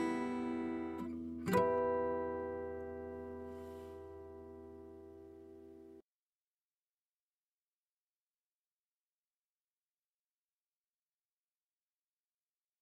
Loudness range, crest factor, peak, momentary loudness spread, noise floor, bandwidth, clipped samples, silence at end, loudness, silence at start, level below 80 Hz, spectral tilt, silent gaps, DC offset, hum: 22 LU; 26 dB; -18 dBFS; 22 LU; under -90 dBFS; 15.5 kHz; under 0.1%; 6.8 s; -40 LUFS; 0 s; -68 dBFS; -7 dB/octave; none; under 0.1%; none